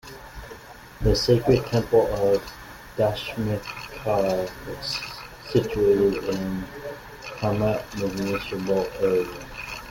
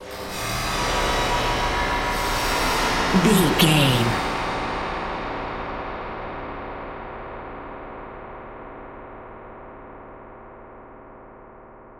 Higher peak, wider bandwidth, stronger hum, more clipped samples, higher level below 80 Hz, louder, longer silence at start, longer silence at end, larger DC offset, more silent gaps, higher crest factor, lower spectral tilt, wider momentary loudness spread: second, -6 dBFS vs -2 dBFS; about the same, 17 kHz vs 17 kHz; neither; neither; second, -42 dBFS vs -36 dBFS; about the same, -24 LUFS vs -22 LUFS; about the same, 0.05 s vs 0 s; about the same, 0 s vs 0 s; neither; neither; about the same, 18 dB vs 22 dB; first, -6 dB/octave vs -4 dB/octave; second, 18 LU vs 24 LU